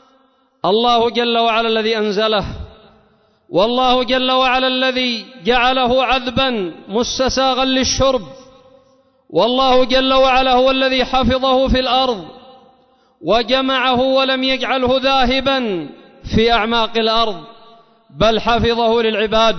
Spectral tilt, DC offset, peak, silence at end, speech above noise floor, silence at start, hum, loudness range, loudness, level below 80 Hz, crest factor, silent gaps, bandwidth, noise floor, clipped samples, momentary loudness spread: -4 dB/octave; under 0.1%; -2 dBFS; 0 s; 41 dB; 0.65 s; none; 3 LU; -15 LUFS; -36 dBFS; 14 dB; none; 6.4 kHz; -56 dBFS; under 0.1%; 8 LU